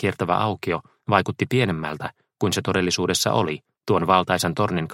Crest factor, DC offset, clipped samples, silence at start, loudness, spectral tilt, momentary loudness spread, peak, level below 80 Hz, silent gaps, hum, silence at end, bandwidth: 22 dB; under 0.1%; under 0.1%; 0 s; -22 LUFS; -4.5 dB/octave; 9 LU; 0 dBFS; -54 dBFS; none; none; 0 s; 16.5 kHz